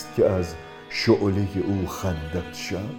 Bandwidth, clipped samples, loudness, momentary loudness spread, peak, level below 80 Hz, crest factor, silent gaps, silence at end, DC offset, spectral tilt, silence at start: 18 kHz; under 0.1%; -25 LUFS; 10 LU; -6 dBFS; -44 dBFS; 20 dB; none; 0 s; under 0.1%; -6 dB/octave; 0 s